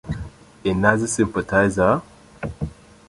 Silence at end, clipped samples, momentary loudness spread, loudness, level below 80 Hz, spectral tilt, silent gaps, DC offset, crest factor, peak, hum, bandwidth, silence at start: 0.35 s; under 0.1%; 15 LU; -20 LUFS; -40 dBFS; -5.5 dB/octave; none; under 0.1%; 20 dB; -2 dBFS; none; 11.5 kHz; 0.05 s